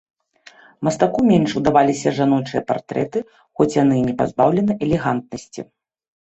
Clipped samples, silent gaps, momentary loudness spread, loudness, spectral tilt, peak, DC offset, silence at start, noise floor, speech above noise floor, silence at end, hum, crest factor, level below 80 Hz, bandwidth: under 0.1%; none; 16 LU; -19 LUFS; -6.5 dB/octave; -2 dBFS; under 0.1%; 0.8 s; -49 dBFS; 31 dB; 0.65 s; none; 18 dB; -50 dBFS; 8.2 kHz